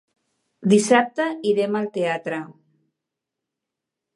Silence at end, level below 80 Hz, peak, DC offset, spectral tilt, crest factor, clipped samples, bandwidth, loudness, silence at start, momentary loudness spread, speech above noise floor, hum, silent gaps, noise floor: 1.65 s; -76 dBFS; -2 dBFS; under 0.1%; -5 dB/octave; 22 dB; under 0.1%; 11.5 kHz; -21 LUFS; 0.6 s; 14 LU; 64 dB; none; none; -84 dBFS